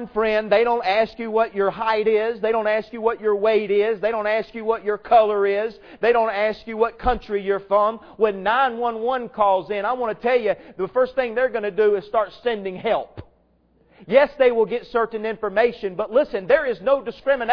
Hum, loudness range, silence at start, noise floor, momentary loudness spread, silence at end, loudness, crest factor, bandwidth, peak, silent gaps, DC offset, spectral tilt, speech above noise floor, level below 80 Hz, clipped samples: none; 2 LU; 0 s; -60 dBFS; 7 LU; 0 s; -21 LUFS; 18 dB; 5.4 kHz; -2 dBFS; none; under 0.1%; -7 dB/octave; 40 dB; -48 dBFS; under 0.1%